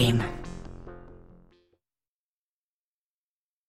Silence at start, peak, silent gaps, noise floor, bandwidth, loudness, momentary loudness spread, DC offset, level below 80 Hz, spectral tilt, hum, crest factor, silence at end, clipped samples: 0 s; -10 dBFS; none; under -90 dBFS; 14.5 kHz; -31 LUFS; 25 LU; under 0.1%; -46 dBFS; -6 dB/octave; none; 22 dB; 2.35 s; under 0.1%